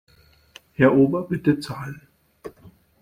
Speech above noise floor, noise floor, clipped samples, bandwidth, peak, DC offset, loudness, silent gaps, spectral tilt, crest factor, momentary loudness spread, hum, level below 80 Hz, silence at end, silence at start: 32 dB; -52 dBFS; under 0.1%; 14.5 kHz; -4 dBFS; under 0.1%; -20 LUFS; none; -8 dB/octave; 20 dB; 26 LU; none; -56 dBFS; 0.5 s; 0.8 s